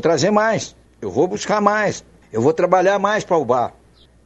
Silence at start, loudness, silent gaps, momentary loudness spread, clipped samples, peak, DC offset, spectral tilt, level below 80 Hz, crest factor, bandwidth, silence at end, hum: 0 s; -18 LUFS; none; 12 LU; under 0.1%; 0 dBFS; under 0.1%; -5 dB/octave; -54 dBFS; 18 dB; 8.6 kHz; 0.55 s; none